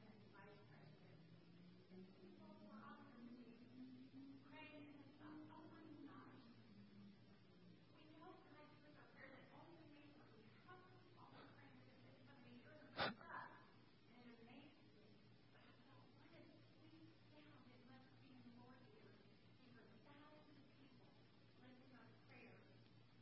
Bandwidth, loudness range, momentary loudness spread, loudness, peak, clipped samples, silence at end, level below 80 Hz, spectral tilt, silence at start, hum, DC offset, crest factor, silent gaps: 5.6 kHz; 12 LU; 8 LU; -62 LUFS; -32 dBFS; under 0.1%; 0 s; -88 dBFS; -3.5 dB/octave; 0 s; 60 Hz at -80 dBFS; under 0.1%; 32 dB; none